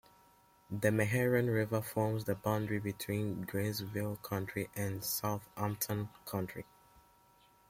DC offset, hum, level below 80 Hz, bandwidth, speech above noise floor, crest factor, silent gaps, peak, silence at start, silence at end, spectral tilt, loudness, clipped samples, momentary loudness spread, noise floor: under 0.1%; none; -66 dBFS; 16.5 kHz; 31 dB; 22 dB; none; -16 dBFS; 0.7 s; 1.05 s; -5.5 dB/octave; -36 LUFS; under 0.1%; 9 LU; -66 dBFS